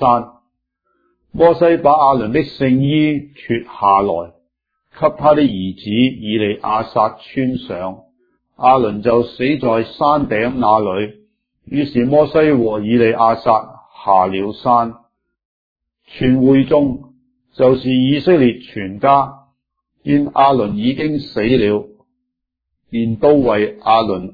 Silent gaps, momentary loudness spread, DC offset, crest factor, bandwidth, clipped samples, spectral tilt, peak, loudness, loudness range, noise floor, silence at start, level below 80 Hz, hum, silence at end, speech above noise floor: 15.45-15.76 s; 11 LU; under 0.1%; 16 dB; 5 kHz; under 0.1%; -9.5 dB/octave; 0 dBFS; -15 LUFS; 3 LU; -77 dBFS; 0 s; -46 dBFS; none; 0.05 s; 63 dB